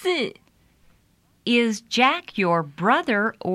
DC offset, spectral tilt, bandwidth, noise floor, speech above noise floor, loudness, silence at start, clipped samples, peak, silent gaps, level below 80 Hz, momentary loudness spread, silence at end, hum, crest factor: under 0.1%; -4.5 dB/octave; 13.5 kHz; -62 dBFS; 40 dB; -22 LUFS; 0 s; under 0.1%; -4 dBFS; none; -66 dBFS; 6 LU; 0 s; none; 20 dB